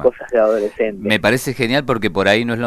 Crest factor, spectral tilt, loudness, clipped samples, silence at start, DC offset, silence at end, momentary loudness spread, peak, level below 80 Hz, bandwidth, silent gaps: 16 dB; -5 dB/octave; -17 LUFS; under 0.1%; 0 s; under 0.1%; 0 s; 4 LU; 0 dBFS; -46 dBFS; 13.5 kHz; none